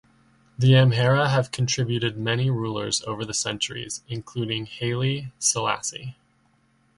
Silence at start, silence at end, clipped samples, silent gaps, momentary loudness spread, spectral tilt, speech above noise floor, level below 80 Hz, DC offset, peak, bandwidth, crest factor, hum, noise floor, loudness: 0.6 s; 0.85 s; under 0.1%; none; 13 LU; -4.5 dB/octave; 40 dB; -56 dBFS; under 0.1%; -6 dBFS; 11.5 kHz; 18 dB; none; -64 dBFS; -24 LUFS